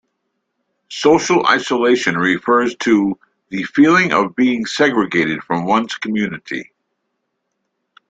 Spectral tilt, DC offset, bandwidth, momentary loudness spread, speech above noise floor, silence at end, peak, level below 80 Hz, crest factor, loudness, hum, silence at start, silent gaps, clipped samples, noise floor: -4.5 dB/octave; under 0.1%; 9 kHz; 13 LU; 57 dB; 1.45 s; -2 dBFS; -56 dBFS; 16 dB; -15 LUFS; none; 0.9 s; none; under 0.1%; -73 dBFS